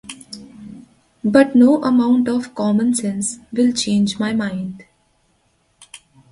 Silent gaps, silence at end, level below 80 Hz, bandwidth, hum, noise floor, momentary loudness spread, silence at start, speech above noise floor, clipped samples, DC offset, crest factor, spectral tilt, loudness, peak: none; 1.5 s; -58 dBFS; 11.5 kHz; none; -62 dBFS; 22 LU; 0.1 s; 46 dB; under 0.1%; under 0.1%; 18 dB; -5 dB/octave; -17 LUFS; 0 dBFS